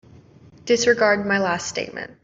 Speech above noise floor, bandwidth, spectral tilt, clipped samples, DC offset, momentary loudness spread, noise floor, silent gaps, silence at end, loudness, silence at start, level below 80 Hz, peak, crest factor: 28 dB; 7.8 kHz; -3.5 dB/octave; under 0.1%; under 0.1%; 13 LU; -48 dBFS; none; 0.1 s; -20 LUFS; 0.65 s; -60 dBFS; -4 dBFS; 18 dB